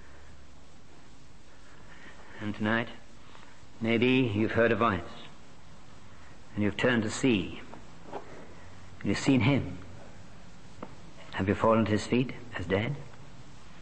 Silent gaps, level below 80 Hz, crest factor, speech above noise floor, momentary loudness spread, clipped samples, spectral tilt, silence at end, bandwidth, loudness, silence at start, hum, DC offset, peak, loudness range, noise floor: none; -58 dBFS; 20 dB; 27 dB; 25 LU; under 0.1%; -6 dB/octave; 0 s; 8.8 kHz; -29 LUFS; 0.25 s; none; 0.8%; -12 dBFS; 5 LU; -55 dBFS